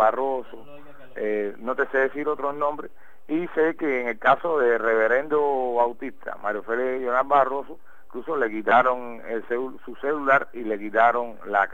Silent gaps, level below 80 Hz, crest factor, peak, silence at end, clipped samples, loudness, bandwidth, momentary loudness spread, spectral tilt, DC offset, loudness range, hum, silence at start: none; -64 dBFS; 20 dB; -4 dBFS; 0.05 s; under 0.1%; -24 LUFS; 15.5 kHz; 12 LU; -6.5 dB/octave; 1%; 3 LU; none; 0 s